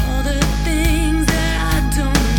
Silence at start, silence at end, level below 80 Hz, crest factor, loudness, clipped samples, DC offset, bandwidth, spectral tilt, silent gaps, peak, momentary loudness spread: 0 s; 0 s; -18 dBFS; 14 dB; -18 LUFS; under 0.1%; under 0.1%; 18 kHz; -4.5 dB/octave; none; -2 dBFS; 2 LU